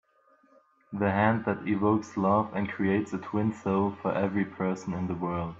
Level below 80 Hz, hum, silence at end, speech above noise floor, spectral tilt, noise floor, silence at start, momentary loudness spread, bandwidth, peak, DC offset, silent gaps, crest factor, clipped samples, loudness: -64 dBFS; none; 0 s; 36 dB; -8 dB/octave; -64 dBFS; 0.9 s; 6 LU; 7.8 kHz; -12 dBFS; under 0.1%; none; 16 dB; under 0.1%; -28 LUFS